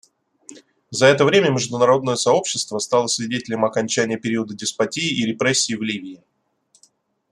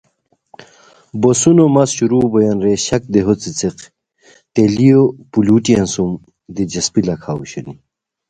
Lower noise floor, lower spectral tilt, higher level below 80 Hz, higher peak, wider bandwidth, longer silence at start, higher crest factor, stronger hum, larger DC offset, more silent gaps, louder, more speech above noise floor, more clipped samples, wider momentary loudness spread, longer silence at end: about the same, -61 dBFS vs -61 dBFS; second, -3.5 dB/octave vs -5.5 dB/octave; second, -64 dBFS vs -46 dBFS; about the same, -2 dBFS vs 0 dBFS; first, 12.5 kHz vs 9.6 kHz; about the same, 0.5 s vs 0.6 s; about the same, 18 dB vs 14 dB; neither; neither; neither; second, -19 LUFS vs -14 LUFS; second, 42 dB vs 47 dB; neither; second, 9 LU vs 14 LU; first, 1.15 s vs 0.55 s